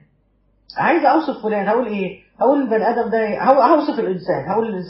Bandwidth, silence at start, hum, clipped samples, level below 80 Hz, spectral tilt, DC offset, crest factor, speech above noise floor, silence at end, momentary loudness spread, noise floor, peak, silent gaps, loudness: 5.8 kHz; 0.75 s; none; under 0.1%; -58 dBFS; -5 dB/octave; under 0.1%; 18 dB; 43 dB; 0 s; 8 LU; -60 dBFS; 0 dBFS; none; -18 LUFS